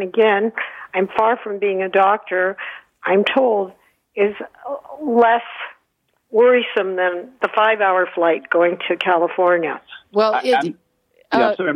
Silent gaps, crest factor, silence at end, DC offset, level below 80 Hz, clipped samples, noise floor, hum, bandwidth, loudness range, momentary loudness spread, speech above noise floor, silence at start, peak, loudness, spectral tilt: none; 14 dB; 0 s; under 0.1%; -68 dBFS; under 0.1%; -68 dBFS; none; 10 kHz; 2 LU; 15 LU; 50 dB; 0 s; -4 dBFS; -18 LUFS; -6 dB/octave